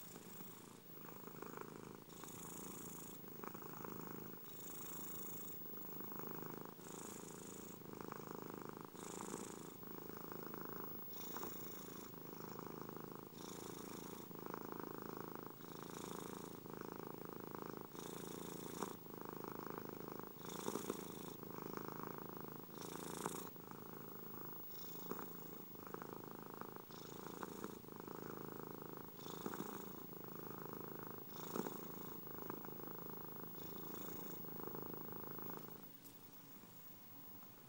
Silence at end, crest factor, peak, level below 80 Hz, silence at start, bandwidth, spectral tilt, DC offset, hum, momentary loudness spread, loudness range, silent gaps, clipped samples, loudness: 0 s; 26 dB; -26 dBFS; -80 dBFS; 0 s; 16 kHz; -4.5 dB/octave; under 0.1%; none; 6 LU; 3 LU; none; under 0.1%; -50 LUFS